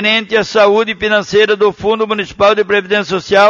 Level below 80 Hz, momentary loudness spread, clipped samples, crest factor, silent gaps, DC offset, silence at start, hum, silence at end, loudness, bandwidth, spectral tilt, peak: -46 dBFS; 5 LU; under 0.1%; 12 dB; none; under 0.1%; 0 s; none; 0 s; -12 LUFS; 7.4 kHz; -4 dB/octave; 0 dBFS